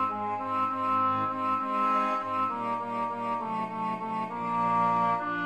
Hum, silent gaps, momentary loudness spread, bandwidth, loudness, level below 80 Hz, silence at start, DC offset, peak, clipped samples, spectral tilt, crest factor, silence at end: none; none; 7 LU; 12 kHz; -29 LUFS; -72 dBFS; 0 s; under 0.1%; -16 dBFS; under 0.1%; -6.5 dB/octave; 14 dB; 0 s